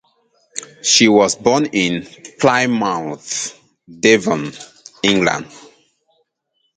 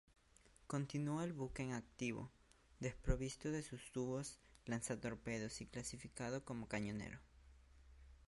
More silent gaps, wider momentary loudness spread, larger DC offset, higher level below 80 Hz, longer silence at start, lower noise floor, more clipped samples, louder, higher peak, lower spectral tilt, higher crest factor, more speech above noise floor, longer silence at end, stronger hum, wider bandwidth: neither; first, 19 LU vs 9 LU; neither; about the same, -56 dBFS vs -56 dBFS; about the same, 0.55 s vs 0.45 s; about the same, -69 dBFS vs -70 dBFS; neither; first, -16 LUFS vs -46 LUFS; first, 0 dBFS vs -24 dBFS; second, -3 dB/octave vs -5.5 dB/octave; second, 18 dB vs 24 dB; first, 53 dB vs 25 dB; first, 1.15 s vs 0 s; neither; second, 9.6 kHz vs 11.5 kHz